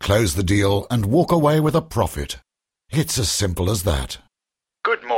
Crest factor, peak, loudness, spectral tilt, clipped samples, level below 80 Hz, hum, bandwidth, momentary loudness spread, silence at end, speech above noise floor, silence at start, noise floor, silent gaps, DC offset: 16 dB; -4 dBFS; -20 LUFS; -5 dB/octave; under 0.1%; -36 dBFS; none; 16.5 kHz; 12 LU; 0 s; 67 dB; 0 s; -86 dBFS; none; under 0.1%